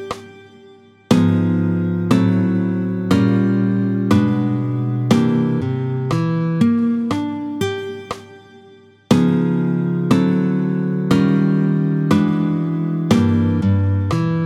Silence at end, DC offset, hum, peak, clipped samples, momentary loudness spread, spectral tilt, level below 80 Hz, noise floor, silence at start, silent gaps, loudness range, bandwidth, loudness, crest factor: 0 s; under 0.1%; none; 0 dBFS; under 0.1%; 7 LU; -8 dB/octave; -52 dBFS; -46 dBFS; 0 s; none; 4 LU; 13.5 kHz; -17 LUFS; 16 dB